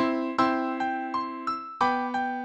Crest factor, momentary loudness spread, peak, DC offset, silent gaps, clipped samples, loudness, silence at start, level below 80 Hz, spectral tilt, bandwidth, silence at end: 18 dB; 6 LU; -10 dBFS; under 0.1%; none; under 0.1%; -28 LUFS; 0 s; -68 dBFS; -5 dB/octave; 9 kHz; 0 s